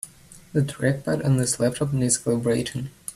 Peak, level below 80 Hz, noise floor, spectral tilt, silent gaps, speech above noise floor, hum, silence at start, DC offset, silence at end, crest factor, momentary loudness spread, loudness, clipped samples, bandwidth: -6 dBFS; -52 dBFS; -48 dBFS; -5 dB/octave; none; 25 dB; none; 0.05 s; under 0.1%; 0.05 s; 18 dB; 8 LU; -24 LUFS; under 0.1%; 14 kHz